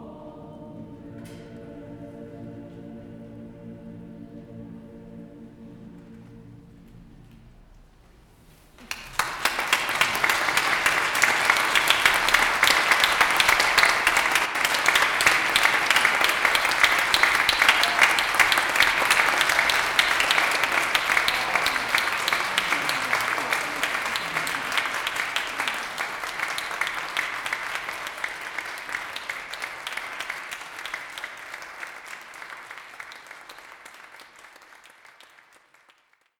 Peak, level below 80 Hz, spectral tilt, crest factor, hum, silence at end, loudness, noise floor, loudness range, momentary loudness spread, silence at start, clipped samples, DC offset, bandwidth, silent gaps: -4 dBFS; -54 dBFS; -0.5 dB/octave; 22 dB; none; 1.9 s; -21 LUFS; -62 dBFS; 23 LU; 24 LU; 0 s; under 0.1%; under 0.1%; 19.5 kHz; none